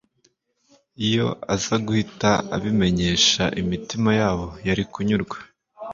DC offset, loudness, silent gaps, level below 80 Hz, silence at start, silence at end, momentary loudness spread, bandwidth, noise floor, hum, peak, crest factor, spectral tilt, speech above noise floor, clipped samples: under 0.1%; -22 LUFS; none; -44 dBFS; 1 s; 0 s; 9 LU; 7.6 kHz; -65 dBFS; none; -4 dBFS; 20 dB; -4.5 dB/octave; 44 dB; under 0.1%